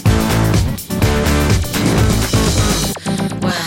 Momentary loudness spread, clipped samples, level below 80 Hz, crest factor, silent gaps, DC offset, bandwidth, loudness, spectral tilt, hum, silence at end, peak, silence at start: 5 LU; under 0.1%; -22 dBFS; 12 dB; none; under 0.1%; 17 kHz; -15 LUFS; -5 dB/octave; none; 0 s; -2 dBFS; 0 s